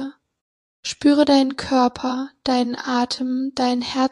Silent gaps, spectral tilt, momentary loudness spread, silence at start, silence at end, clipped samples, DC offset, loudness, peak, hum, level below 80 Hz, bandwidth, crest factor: 0.41-0.83 s; -3.5 dB/octave; 10 LU; 0 s; 0.05 s; under 0.1%; under 0.1%; -20 LUFS; -4 dBFS; none; -56 dBFS; 11 kHz; 16 dB